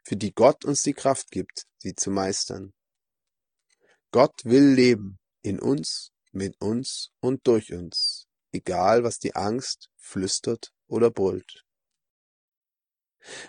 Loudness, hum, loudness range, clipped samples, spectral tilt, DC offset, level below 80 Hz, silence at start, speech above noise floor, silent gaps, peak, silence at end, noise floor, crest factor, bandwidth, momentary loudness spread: -24 LUFS; none; 6 LU; under 0.1%; -4.5 dB/octave; under 0.1%; -66 dBFS; 0.05 s; over 66 dB; 12.10-12.48 s, 12.57-12.61 s; -4 dBFS; 0 s; under -90 dBFS; 22 dB; 10 kHz; 16 LU